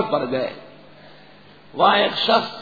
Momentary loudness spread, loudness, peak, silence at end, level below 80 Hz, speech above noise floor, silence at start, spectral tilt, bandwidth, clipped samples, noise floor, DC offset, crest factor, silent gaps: 18 LU; -19 LUFS; -2 dBFS; 0 s; -66 dBFS; 28 dB; 0 s; -5.5 dB/octave; 5 kHz; under 0.1%; -48 dBFS; 0.3%; 20 dB; none